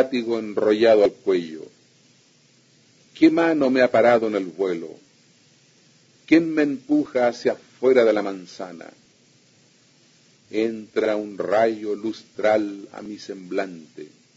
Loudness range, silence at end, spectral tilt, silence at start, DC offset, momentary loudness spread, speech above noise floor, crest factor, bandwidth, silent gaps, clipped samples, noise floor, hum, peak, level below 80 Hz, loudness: 5 LU; 0.3 s; -6 dB/octave; 0 s; under 0.1%; 19 LU; 37 dB; 20 dB; 7.8 kHz; none; under 0.1%; -58 dBFS; none; -2 dBFS; -70 dBFS; -21 LUFS